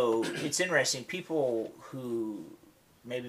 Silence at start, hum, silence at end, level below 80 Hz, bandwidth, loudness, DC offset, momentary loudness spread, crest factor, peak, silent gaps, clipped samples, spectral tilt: 0 s; none; 0 s; -76 dBFS; 15.5 kHz; -31 LUFS; under 0.1%; 14 LU; 20 dB; -12 dBFS; none; under 0.1%; -3 dB/octave